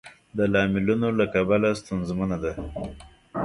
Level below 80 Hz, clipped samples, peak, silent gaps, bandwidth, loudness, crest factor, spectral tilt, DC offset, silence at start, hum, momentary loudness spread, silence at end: -46 dBFS; under 0.1%; -8 dBFS; none; 11.5 kHz; -24 LUFS; 18 dB; -7 dB/octave; under 0.1%; 0.05 s; none; 13 LU; 0 s